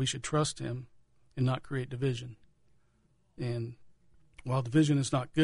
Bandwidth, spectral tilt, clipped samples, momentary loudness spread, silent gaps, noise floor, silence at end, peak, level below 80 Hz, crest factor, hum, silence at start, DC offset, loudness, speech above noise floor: 11 kHz; -5.5 dB/octave; under 0.1%; 16 LU; none; -69 dBFS; 0 s; -16 dBFS; -60 dBFS; 18 dB; none; 0 s; under 0.1%; -32 LUFS; 39 dB